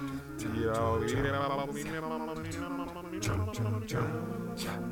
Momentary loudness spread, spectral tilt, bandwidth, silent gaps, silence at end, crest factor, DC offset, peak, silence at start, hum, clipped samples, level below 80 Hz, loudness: 7 LU; -6 dB/octave; 18 kHz; none; 0 s; 14 dB; under 0.1%; -18 dBFS; 0 s; none; under 0.1%; -52 dBFS; -34 LUFS